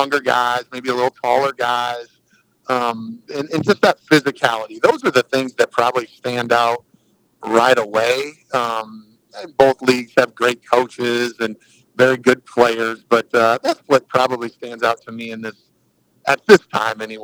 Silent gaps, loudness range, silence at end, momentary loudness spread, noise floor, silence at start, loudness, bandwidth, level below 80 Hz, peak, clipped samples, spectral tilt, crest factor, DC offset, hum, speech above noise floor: none; 3 LU; 0 s; 13 LU; -61 dBFS; 0 s; -17 LUFS; over 20 kHz; -60 dBFS; 0 dBFS; under 0.1%; -4.5 dB/octave; 18 dB; under 0.1%; none; 44 dB